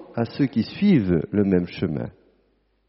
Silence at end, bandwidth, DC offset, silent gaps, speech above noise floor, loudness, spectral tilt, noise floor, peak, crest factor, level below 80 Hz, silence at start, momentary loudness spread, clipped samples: 0.8 s; 5.8 kHz; under 0.1%; none; 44 dB; -22 LUFS; -7.5 dB/octave; -65 dBFS; -6 dBFS; 16 dB; -50 dBFS; 0 s; 9 LU; under 0.1%